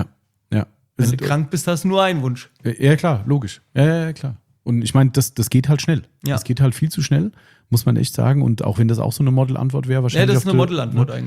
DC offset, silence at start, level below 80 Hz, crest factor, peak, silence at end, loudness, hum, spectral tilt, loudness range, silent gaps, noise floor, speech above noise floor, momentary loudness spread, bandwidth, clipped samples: under 0.1%; 0 s; -50 dBFS; 16 dB; -2 dBFS; 0 s; -18 LUFS; none; -6.5 dB/octave; 2 LU; none; -39 dBFS; 22 dB; 9 LU; 15.5 kHz; under 0.1%